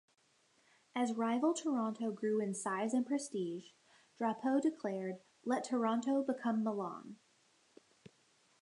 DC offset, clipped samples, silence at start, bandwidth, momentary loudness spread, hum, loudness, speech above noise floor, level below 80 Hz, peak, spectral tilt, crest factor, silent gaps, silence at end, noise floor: under 0.1%; under 0.1%; 0.95 s; 11 kHz; 11 LU; none; -37 LUFS; 36 dB; under -90 dBFS; -20 dBFS; -5 dB/octave; 16 dB; none; 1.5 s; -73 dBFS